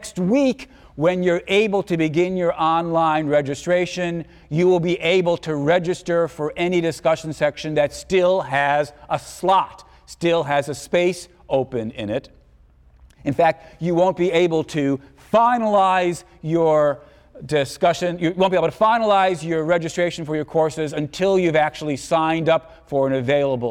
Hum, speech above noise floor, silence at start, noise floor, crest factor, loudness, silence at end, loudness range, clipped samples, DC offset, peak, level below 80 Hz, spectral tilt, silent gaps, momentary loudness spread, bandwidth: none; 32 dB; 0 s; -52 dBFS; 14 dB; -20 LUFS; 0 s; 3 LU; under 0.1%; under 0.1%; -6 dBFS; -52 dBFS; -6 dB/octave; none; 9 LU; 14.5 kHz